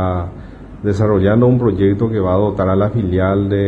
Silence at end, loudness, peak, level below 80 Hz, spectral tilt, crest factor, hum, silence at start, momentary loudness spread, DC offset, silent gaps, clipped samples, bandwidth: 0 s; -15 LUFS; 0 dBFS; -36 dBFS; -9.5 dB/octave; 14 dB; none; 0 s; 11 LU; under 0.1%; none; under 0.1%; 7.8 kHz